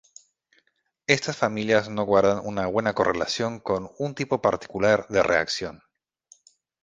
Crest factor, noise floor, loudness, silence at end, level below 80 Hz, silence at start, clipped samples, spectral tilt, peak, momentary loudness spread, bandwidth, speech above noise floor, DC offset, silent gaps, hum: 24 dB; -70 dBFS; -24 LUFS; 1.1 s; -56 dBFS; 1.1 s; under 0.1%; -4.5 dB/octave; 0 dBFS; 8 LU; 9.6 kHz; 46 dB; under 0.1%; none; none